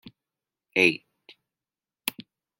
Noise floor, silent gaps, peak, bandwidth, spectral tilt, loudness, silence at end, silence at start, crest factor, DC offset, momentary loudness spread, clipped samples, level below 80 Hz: under -90 dBFS; none; -4 dBFS; 16.5 kHz; -3.5 dB/octave; -25 LUFS; 0.5 s; 0.05 s; 28 dB; under 0.1%; 13 LU; under 0.1%; -74 dBFS